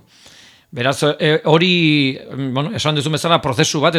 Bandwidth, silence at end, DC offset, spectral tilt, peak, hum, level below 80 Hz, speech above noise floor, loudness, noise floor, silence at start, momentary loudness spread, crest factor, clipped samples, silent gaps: 14 kHz; 0 s; under 0.1%; -4.5 dB/octave; 0 dBFS; none; -54 dBFS; 30 dB; -16 LUFS; -45 dBFS; 0.75 s; 8 LU; 16 dB; under 0.1%; none